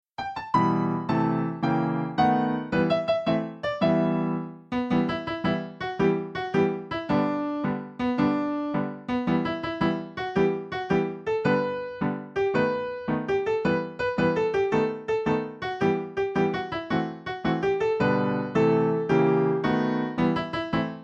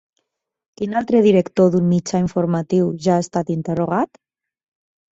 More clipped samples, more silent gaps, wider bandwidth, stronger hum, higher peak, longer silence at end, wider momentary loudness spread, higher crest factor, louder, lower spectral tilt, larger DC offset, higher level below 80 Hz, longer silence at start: neither; neither; about the same, 8 kHz vs 8 kHz; neither; second, -8 dBFS vs -2 dBFS; second, 0 s vs 1.1 s; about the same, 7 LU vs 8 LU; about the same, 16 dB vs 16 dB; second, -26 LUFS vs -18 LUFS; about the same, -8 dB/octave vs -7.5 dB/octave; neither; about the same, -54 dBFS vs -56 dBFS; second, 0.2 s vs 0.8 s